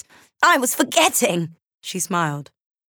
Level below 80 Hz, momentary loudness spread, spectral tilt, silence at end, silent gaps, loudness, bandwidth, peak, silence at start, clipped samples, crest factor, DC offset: -74 dBFS; 16 LU; -2.5 dB/octave; 0.45 s; 1.74-1.78 s; -19 LUFS; over 20 kHz; -4 dBFS; 0.4 s; under 0.1%; 18 dB; under 0.1%